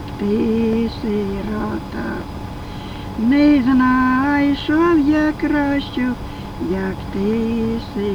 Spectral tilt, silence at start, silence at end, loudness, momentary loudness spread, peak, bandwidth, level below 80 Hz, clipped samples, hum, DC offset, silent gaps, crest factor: -7 dB/octave; 0 s; 0 s; -18 LUFS; 14 LU; -4 dBFS; 14 kHz; -36 dBFS; under 0.1%; none; under 0.1%; none; 14 dB